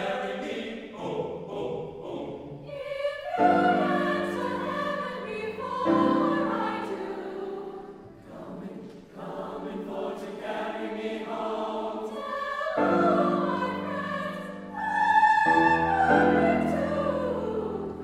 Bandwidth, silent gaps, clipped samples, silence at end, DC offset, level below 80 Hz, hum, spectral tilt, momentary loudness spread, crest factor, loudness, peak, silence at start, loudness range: 13 kHz; none; under 0.1%; 0 s; under 0.1%; -56 dBFS; none; -6.5 dB/octave; 17 LU; 20 dB; -27 LUFS; -8 dBFS; 0 s; 13 LU